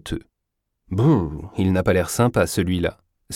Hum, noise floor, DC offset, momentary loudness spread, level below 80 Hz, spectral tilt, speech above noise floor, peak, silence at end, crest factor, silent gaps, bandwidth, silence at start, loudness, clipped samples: none; -78 dBFS; under 0.1%; 11 LU; -42 dBFS; -6 dB/octave; 58 dB; -4 dBFS; 0 s; 18 dB; none; 16.5 kHz; 0.05 s; -21 LUFS; under 0.1%